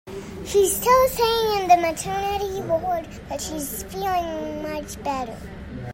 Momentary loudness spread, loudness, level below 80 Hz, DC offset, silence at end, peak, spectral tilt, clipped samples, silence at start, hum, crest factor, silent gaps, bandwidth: 16 LU; -23 LUFS; -44 dBFS; under 0.1%; 0 s; -4 dBFS; -3.5 dB/octave; under 0.1%; 0.05 s; none; 18 dB; none; 16.5 kHz